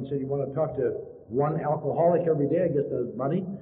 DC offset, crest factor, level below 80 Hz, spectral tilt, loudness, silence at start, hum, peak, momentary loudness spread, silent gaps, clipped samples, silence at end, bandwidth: under 0.1%; 14 dB; -62 dBFS; -10 dB/octave; -27 LUFS; 0 s; none; -12 dBFS; 7 LU; none; under 0.1%; 0 s; 3.9 kHz